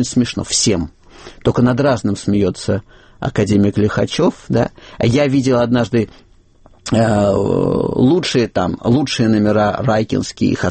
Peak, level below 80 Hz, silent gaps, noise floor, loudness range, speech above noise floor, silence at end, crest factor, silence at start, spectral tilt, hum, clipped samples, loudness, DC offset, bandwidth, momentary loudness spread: -2 dBFS; -40 dBFS; none; -47 dBFS; 2 LU; 32 dB; 0 s; 12 dB; 0 s; -5.5 dB/octave; none; under 0.1%; -16 LUFS; under 0.1%; 8.8 kHz; 7 LU